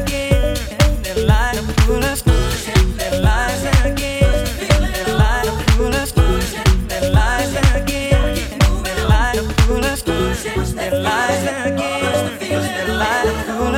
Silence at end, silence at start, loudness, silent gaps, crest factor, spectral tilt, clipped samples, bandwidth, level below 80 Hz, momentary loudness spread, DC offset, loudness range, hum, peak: 0 s; 0 s; -17 LUFS; none; 16 dB; -5 dB/octave; under 0.1%; 17 kHz; -20 dBFS; 4 LU; under 0.1%; 2 LU; none; 0 dBFS